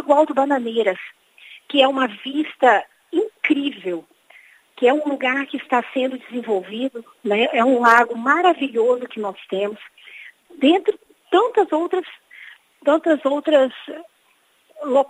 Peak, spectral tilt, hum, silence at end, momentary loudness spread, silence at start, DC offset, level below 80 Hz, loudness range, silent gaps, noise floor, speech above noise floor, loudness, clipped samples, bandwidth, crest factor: 0 dBFS; -4.5 dB/octave; none; 0.05 s; 16 LU; 0 s; under 0.1%; -78 dBFS; 4 LU; none; -60 dBFS; 42 dB; -19 LUFS; under 0.1%; 15 kHz; 20 dB